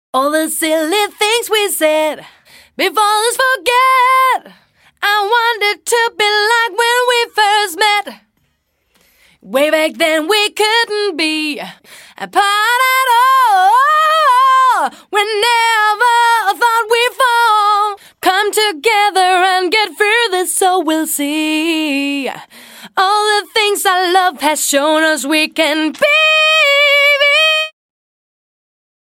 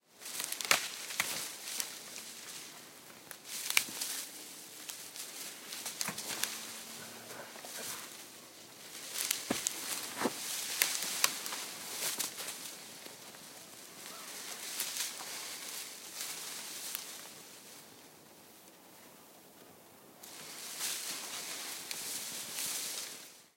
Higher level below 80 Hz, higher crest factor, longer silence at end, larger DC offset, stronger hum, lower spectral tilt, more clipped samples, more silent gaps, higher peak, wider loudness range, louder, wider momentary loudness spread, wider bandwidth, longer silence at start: first, -66 dBFS vs -86 dBFS; second, 12 dB vs 36 dB; first, 1.35 s vs 0.05 s; neither; neither; about the same, 0 dB/octave vs 0.5 dB/octave; neither; neither; first, 0 dBFS vs -6 dBFS; second, 4 LU vs 10 LU; first, -12 LUFS vs -37 LUFS; second, 7 LU vs 20 LU; about the same, 16.5 kHz vs 17 kHz; about the same, 0.15 s vs 0.1 s